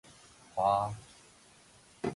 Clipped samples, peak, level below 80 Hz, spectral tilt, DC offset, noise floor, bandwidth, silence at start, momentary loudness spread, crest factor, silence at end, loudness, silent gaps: under 0.1%; -16 dBFS; -64 dBFS; -6 dB/octave; under 0.1%; -60 dBFS; 11.5 kHz; 0.55 s; 26 LU; 20 dB; 0 s; -32 LUFS; none